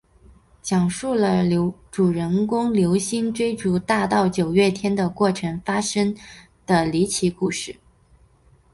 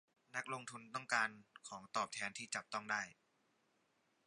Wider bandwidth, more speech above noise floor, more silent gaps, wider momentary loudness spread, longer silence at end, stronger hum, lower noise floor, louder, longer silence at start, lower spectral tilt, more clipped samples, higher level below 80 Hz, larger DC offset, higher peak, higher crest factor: about the same, 11.5 kHz vs 11 kHz; about the same, 35 dB vs 36 dB; neither; second, 6 LU vs 13 LU; second, 1 s vs 1.15 s; neither; second, -55 dBFS vs -80 dBFS; first, -21 LUFS vs -43 LUFS; first, 0.65 s vs 0.35 s; first, -5.5 dB/octave vs -1.5 dB/octave; neither; first, -50 dBFS vs -90 dBFS; neither; first, -4 dBFS vs -20 dBFS; second, 16 dB vs 24 dB